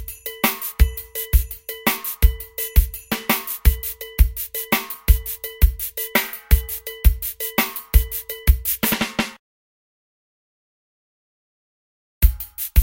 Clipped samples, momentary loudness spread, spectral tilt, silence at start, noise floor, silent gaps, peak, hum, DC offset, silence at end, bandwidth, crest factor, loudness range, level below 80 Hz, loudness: under 0.1%; 7 LU; -4 dB/octave; 0 s; under -90 dBFS; 9.39-12.21 s; 0 dBFS; none; under 0.1%; 0 s; 17.5 kHz; 20 dB; 7 LU; -22 dBFS; -22 LUFS